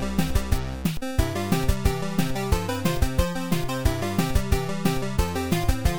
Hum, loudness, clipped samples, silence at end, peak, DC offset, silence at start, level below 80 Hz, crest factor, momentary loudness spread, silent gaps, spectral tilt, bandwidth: none; -26 LUFS; under 0.1%; 0 s; -6 dBFS; 2%; 0 s; -28 dBFS; 18 dB; 2 LU; none; -5.5 dB/octave; over 20 kHz